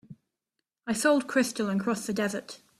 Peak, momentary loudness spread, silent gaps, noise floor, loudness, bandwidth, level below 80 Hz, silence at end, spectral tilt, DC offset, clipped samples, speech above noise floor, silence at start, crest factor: -10 dBFS; 10 LU; none; -85 dBFS; -28 LUFS; 15 kHz; -68 dBFS; 0.25 s; -4 dB/octave; under 0.1%; under 0.1%; 57 dB; 0.1 s; 18 dB